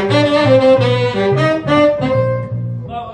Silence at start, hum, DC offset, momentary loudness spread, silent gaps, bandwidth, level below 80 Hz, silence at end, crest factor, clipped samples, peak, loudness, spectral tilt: 0 s; none; under 0.1%; 12 LU; none; 10 kHz; -44 dBFS; 0 s; 12 dB; under 0.1%; -2 dBFS; -13 LUFS; -7 dB/octave